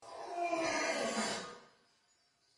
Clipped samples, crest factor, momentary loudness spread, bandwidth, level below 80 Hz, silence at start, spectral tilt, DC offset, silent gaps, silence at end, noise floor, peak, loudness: under 0.1%; 16 dB; 13 LU; 11.5 kHz; -76 dBFS; 0 s; -2 dB/octave; under 0.1%; none; 0.9 s; -74 dBFS; -24 dBFS; -36 LUFS